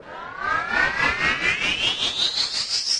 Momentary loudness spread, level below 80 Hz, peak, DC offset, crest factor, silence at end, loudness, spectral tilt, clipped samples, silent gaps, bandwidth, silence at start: 5 LU; -48 dBFS; -6 dBFS; under 0.1%; 18 dB; 0 s; -21 LUFS; -0.5 dB/octave; under 0.1%; none; 11.5 kHz; 0 s